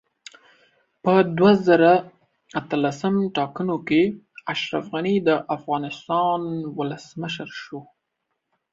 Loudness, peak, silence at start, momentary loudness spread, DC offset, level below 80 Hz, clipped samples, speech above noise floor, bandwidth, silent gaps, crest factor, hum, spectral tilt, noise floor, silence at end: -22 LUFS; -4 dBFS; 1.05 s; 15 LU; under 0.1%; -64 dBFS; under 0.1%; 57 dB; 7.8 kHz; none; 20 dB; none; -6.5 dB/octave; -78 dBFS; 0.9 s